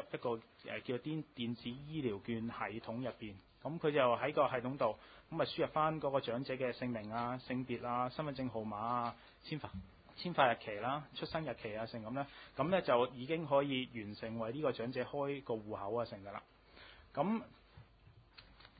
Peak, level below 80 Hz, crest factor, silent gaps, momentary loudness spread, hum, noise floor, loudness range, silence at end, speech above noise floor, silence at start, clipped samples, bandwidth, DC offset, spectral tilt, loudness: -16 dBFS; -68 dBFS; 24 dB; none; 13 LU; none; -64 dBFS; 6 LU; 0.1 s; 25 dB; 0 s; under 0.1%; 4.9 kHz; under 0.1%; -4.5 dB/octave; -39 LUFS